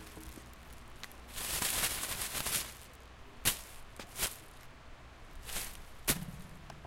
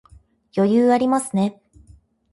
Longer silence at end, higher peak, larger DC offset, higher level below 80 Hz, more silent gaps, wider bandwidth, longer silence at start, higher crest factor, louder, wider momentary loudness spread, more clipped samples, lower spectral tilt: second, 0 s vs 0.8 s; second, -12 dBFS vs -8 dBFS; neither; about the same, -52 dBFS vs -56 dBFS; neither; first, 17 kHz vs 11.5 kHz; second, 0 s vs 0.55 s; first, 28 dB vs 14 dB; second, -36 LUFS vs -19 LUFS; first, 21 LU vs 9 LU; neither; second, -1 dB/octave vs -6.5 dB/octave